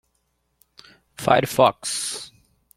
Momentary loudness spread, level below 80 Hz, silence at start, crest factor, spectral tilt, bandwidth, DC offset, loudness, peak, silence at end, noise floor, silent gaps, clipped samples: 14 LU; -58 dBFS; 1.2 s; 22 dB; -3.5 dB/octave; 16.5 kHz; under 0.1%; -21 LUFS; -2 dBFS; 0.5 s; -71 dBFS; none; under 0.1%